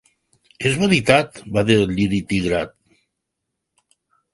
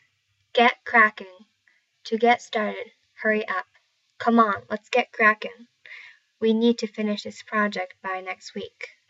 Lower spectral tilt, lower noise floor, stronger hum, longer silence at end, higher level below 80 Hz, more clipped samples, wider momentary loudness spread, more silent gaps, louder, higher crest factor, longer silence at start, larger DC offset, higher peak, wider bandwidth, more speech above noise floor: about the same, -5.5 dB/octave vs -4.5 dB/octave; first, -79 dBFS vs -70 dBFS; neither; first, 1.65 s vs 0.25 s; first, -46 dBFS vs -78 dBFS; neither; second, 8 LU vs 19 LU; neither; first, -19 LUFS vs -23 LUFS; about the same, 20 dB vs 20 dB; about the same, 0.6 s vs 0.55 s; neither; first, 0 dBFS vs -4 dBFS; first, 11.5 kHz vs 8 kHz; first, 61 dB vs 46 dB